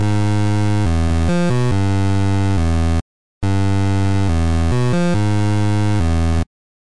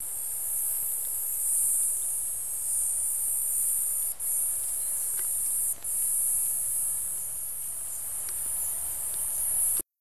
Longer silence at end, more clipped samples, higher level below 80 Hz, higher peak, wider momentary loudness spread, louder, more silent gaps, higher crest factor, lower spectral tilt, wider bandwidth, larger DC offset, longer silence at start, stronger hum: first, 0.4 s vs 0 s; neither; first, -30 dBFS vs -60 dBFS; first, -8 dBFS vs -14 dBFS; second, 3 LU vs 7 LU; first, -18 LUFS vs -26 LUFS; first, 3.02-3.41 s vs none; second, 8 dB vs 16 dB; first, -7 dB/octave vs 0.5 dB/octave; second, 11.5 kHz vs 16 kHz; first, 8% vs 0.7%; about the same, 0 s vs 0 s; neither